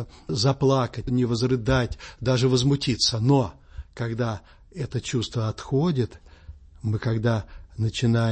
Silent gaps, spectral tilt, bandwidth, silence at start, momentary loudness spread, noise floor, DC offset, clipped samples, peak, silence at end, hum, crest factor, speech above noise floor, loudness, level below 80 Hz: none; -6 dB/octave; 8.8 kHz; 0 s; 11 LU; -45 dBFS; under 0.1%; under 0.1%; -8 dBFS; 0 s; none; 16 dB; 22 dB; -24 LUFS; -44 dBFS